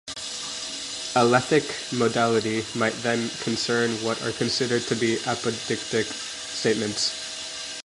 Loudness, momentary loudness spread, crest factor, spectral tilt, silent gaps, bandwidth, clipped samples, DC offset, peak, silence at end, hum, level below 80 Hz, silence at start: -25 LUFS; 9 LU; 20 dB; -3.5 dB/octave; none; 11.5 kHz; under 0.1%; under 0.1%; -4 dBFS; 0 s; none; -62 dBFS; 0.05 s